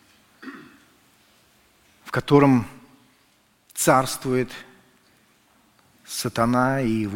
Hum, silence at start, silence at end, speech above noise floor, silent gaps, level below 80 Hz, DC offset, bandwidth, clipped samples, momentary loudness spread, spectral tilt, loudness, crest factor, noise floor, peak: none; 0.45 s; 0 s; 41 dB; none; -52 dBFS; under 0.1%; 17 kHz; under 0.1%; 24 LU; -5.5 dB/octave; -21 LUFS; 22 dB; -62 dBFS; -2 dBFS